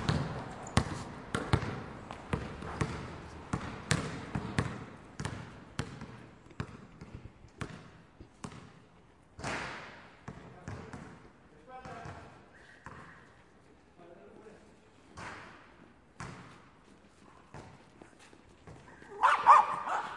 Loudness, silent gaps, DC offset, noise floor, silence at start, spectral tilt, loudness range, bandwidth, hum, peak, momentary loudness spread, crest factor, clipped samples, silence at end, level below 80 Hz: -34 LUFS; none; under 0.1%; -61 dBFS; 0 s; -5 dB/octave; 15 LU; 11.5 kHz; none; -4 dBFS; 22 LU; 32 dB; under 0.1%; 0 s; -54 dBFS